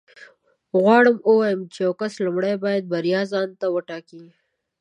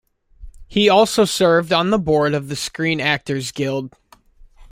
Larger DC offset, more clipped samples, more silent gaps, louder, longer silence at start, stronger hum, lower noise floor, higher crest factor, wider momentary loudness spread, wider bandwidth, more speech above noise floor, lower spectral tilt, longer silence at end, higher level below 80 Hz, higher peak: neither; neither; neither; about the same, -20 LUFS vs -18 LUFS; second, 0.2 s vs 0.4 s; neither; first, -52 dBFS vs -48 dBFS; about the same, 20 dB vs 16 dB; about the same, 10 LU vs 11 LU; second, 10 kHz vs 16.5 kHz; about the same, 32 dB vs 30 dB; first, -6.5 dB/octave vs -4.5 dB/octave; first, 0.55 s vs 0.1 s; second, -76 dBFS vs -46 dBFS; about the same, -2 dBFS vs -2 dBFS